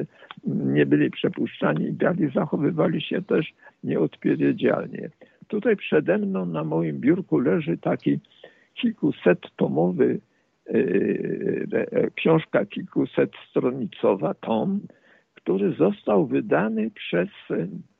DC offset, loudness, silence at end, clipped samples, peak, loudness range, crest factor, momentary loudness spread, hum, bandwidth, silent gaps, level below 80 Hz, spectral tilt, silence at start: under 0.1%; -24 LUFS; 0.15 s; under 0.1%; -8 dBFS; 1 LU; 16 dB; 7 LU; none; 4.1 kHz; none; -66 dBFS; -10 dB/octave; 0 s